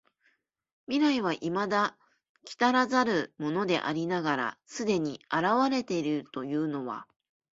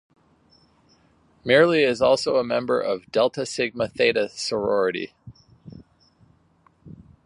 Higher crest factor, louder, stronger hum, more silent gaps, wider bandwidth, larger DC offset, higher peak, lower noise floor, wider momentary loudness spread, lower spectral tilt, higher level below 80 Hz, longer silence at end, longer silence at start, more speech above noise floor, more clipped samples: about the same, 20 dB vs 20 dB; second, -29 LUFS vs -22 LUFS; neither; first, 2.29-2.35 s vs none; second, 7.8 kHz vs 11 kHz; neither; second, -10 dBFS vs -4 dBFS; first, -72 dBFS vs -60 dBFS; about the same, 8 LU vs 8 LU; about the same, -5 dB/octave vs -4.5 dB/octave; second, -72 dBFS vs -60 dBFS; first, 0.5 s vs 0.35 s; second, 0.9 s vs 1.45 s; first, 44 dB vs 39 dB; neither